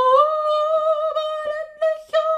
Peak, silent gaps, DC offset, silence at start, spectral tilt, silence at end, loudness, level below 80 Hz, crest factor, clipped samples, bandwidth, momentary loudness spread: -4 dBFS; none; under 0.1%; 0 s; -1 dB/octave; 0 s; -20 LUFS; -66 dBFS; 16 dB; under 0.1%; 9.4 kHz; 9 LU